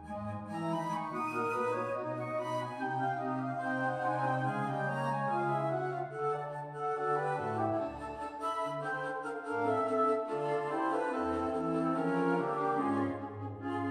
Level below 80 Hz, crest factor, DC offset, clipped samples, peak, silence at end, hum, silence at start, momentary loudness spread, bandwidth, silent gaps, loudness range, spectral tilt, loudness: -66 dBFS; 16 dB; under 0.1%; under 0.1%; -18 dBFS; 0 s; none; 0 s; 7 LU; 12.5 kHz; none; 3 LU; -7 dB/octave; -34 LUFS